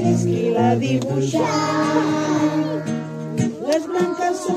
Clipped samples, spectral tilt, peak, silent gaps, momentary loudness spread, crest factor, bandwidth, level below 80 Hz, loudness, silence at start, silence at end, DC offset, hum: under 0.1%; -6 dB/octave; -4 dBFS; none; 6 LU; 16 dB; 14 kHz; -60 dBFS; -20 LUFS; 0 s; 0 s; under 0.1%; none